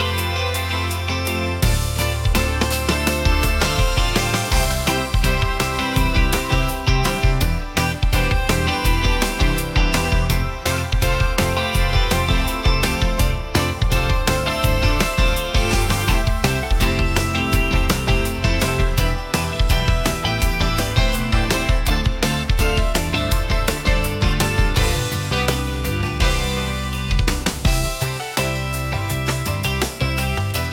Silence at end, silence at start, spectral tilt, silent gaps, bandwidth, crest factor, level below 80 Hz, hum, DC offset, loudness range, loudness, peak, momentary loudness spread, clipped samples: 0 s; 0 s; -4.5 dB/octave; none; 17 kHz; 14 dB; -22 dBFS; none; under 0.1%; 2 LU; -20 LUFS; -4 dBFS; 3 LU; under 0.1%